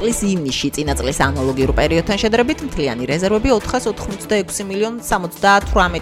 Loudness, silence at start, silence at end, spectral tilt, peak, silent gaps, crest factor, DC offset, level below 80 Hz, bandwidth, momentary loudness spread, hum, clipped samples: -18 LUFS; 0 s; 0 s; -4.5 dB/octave; -2 dBFS; none; 14 dB; under 0.1%; -30 dBFS; 16.5 kHz; 7 LU; none; under 0.1%